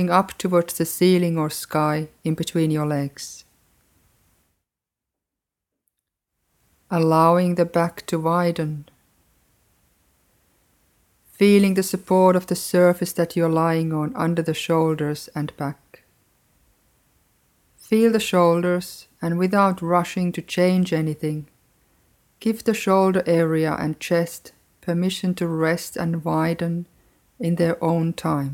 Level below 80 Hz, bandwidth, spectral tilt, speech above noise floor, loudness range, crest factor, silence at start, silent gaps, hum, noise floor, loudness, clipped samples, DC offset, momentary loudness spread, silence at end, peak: -60 dBFS; 17 kHz; -6 dB/octave; 66 dB; 8 LU; 20 dB; 0 s; none; none; -86 dBFS; -21 LUFS; under 0.1%; under 0.1%; 11 LU; 0 s; -2 dBFS